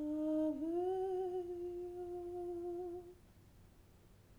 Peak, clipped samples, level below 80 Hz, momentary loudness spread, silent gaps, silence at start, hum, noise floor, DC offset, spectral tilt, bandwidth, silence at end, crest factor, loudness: -28 dBFS; under 0.1%; -66 dBFS; 9 LU; none; 0 s; none; -64 dBFS; under 0.1%; -8 dB/octave; over 20 kHz; 0 s; 14 dB; -41 LUFS